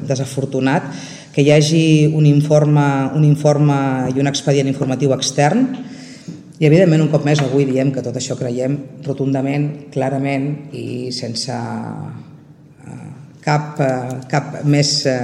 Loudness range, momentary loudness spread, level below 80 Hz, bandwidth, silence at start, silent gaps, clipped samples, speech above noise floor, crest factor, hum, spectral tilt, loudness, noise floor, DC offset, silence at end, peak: 9 LU; 17 LU; -62 dBFS; 11 kHz; 0 s; none; under 0.1%; 27 dB; 16 dB; none; -6 dB/octave; -16 LUFS; -42 dBFS; under 0.1%; 0 s; 0 dBFS